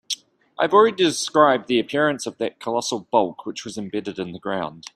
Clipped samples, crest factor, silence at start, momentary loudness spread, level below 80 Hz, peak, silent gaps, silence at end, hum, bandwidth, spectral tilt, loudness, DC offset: under 0.1%; 20 dB; 0.1 s; 14 LU; -66 dBFS; -2 dBFS; none; 0.15 s; none; 14.5 kHz; -3.5 dB/octave; -21 LUFS; under 0.1%